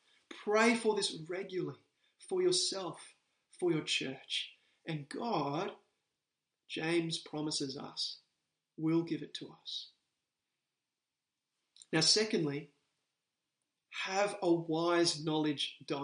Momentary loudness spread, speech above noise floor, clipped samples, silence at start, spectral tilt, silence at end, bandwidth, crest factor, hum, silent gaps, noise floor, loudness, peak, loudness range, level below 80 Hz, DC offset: 15 LU; over 56 dB; under 0.1%; 0.3 s; -3.5 dB/octave; 0 s; 10 kHz; 22 dB; none; none; under -90 dBFS; -34 LUFS; -14 dBFS; 6 LU; -86 dBFS; under 0.1%